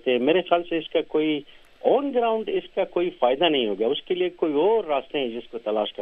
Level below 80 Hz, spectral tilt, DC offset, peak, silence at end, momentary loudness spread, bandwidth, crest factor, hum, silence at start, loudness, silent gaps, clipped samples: -60 dBFS; -7.5 dB/octave; under 0.1%; -6 dBFS; 0 s; 7 LU; 4.4 kHz; 18 dB; none; 0.05 s; -24 LUFS; none; under 0.1%